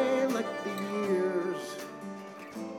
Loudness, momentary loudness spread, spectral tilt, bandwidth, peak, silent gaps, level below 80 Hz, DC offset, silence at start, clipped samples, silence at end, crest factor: -32 LUFS; 13 LU; -5.5 dB/octave; 18 kHz; -18 dBFS; none; -80 dBFS; under 0.1%; 0 s; under 0.1%; 0 s; 14 dB